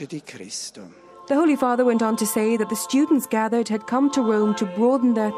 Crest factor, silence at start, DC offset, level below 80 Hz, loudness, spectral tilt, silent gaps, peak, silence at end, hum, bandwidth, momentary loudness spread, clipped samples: 14 dB; 0 s; under 0.1%; -70 dBFS; -21 LUFS; -4.5 dB/octave; none; -8 dBFS; 0 s; none; 15.5 kHz; 12 LU; under 0.1%